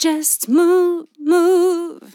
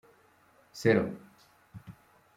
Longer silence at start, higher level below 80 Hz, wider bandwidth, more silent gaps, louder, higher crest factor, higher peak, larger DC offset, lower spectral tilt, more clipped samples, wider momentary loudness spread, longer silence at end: second, 0 s vs 0.75 s; second, under -90 dBFS vs -68 dBFS; first, 17.5 kHz vs 15.5 kHz; neither; first, -16 LUFS vs -29 LUFS; second, 12 dB vs 24 dB; first, -4 dBFS vs -10 dBFS; neither; second, -2 dB/octave vs -6.5 dB/octave; neither; second, 8 LU vs 26 LU; second, 0.2 s vs 0.45 s